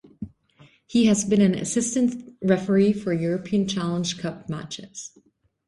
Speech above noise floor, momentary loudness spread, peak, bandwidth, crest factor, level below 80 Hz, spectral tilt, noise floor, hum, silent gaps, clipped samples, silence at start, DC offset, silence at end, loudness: 33 dB; 19 LU; -6 dBFS; 11.5 kHz; 18 dB; -58 dBFS; -5.5 dB/octave; -55 dBFS; none; none; under 0.1%; 0.2 s; under 0.1%; 0.6 s; -23 LUFS